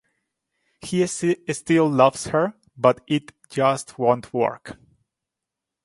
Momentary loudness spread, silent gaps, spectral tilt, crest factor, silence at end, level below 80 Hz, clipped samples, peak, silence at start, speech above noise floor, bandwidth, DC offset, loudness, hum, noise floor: 9 LU; none; -5.5 dB/octave; 22 dB; 1.1 s; -60 dBFS; under 0.1%; -2 dBFS; 0.85 s; 64 dB; 11.5 kHz; under 0.1%; -22 LUFS; none; -85 dBFS